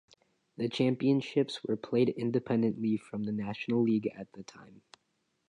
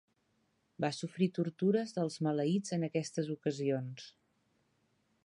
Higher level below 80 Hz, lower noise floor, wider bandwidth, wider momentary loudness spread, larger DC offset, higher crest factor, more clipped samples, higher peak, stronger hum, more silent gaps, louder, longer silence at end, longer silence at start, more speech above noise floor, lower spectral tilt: first, -74 dBFS vs -80 dBFS; about the same, -78 dBFS vs -77 dBFS; about the same, 10.5 kHz vs 11 kHz; first, 10 LU vs 6 LU; neither; about the same, 18 dB vs 18 dB; neither; first, -14 dBFS vs -18 dBFS; neither; neither; first, -31 LUFS vs -35 LUFS; second, 0.85 s vs 1.15 s; second, 0.6 s vs 0.8 s; first, 47 dB vs 43 dB; about the same, -7.5 dB/octave vs -6.5 dB/octave